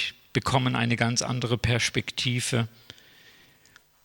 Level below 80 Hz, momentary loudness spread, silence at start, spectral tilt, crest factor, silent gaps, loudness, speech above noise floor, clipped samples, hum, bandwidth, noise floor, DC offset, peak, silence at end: -52 dBFS; 5 LU; 0 s; -4 dB/octave; 22 dB; none; -26 LUFS; 32 dB; under 0.1%; none; 17 kHz; -58 dBFS; under 0.1%; -6 dBFS; 1.35 s